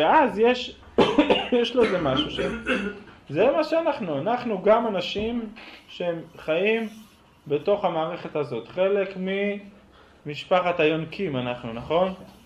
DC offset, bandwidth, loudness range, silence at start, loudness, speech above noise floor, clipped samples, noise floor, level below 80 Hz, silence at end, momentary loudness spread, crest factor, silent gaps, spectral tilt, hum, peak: under 0.1%; 11 kHz; 4 LU; 0 s; -24 LUFS; 28 dB; under 0.1%; -52 dBFS; -52 dBFS; 0.15 s; 12 LU; 18 dB; none; -6 dB/octave; none; -6 dBFS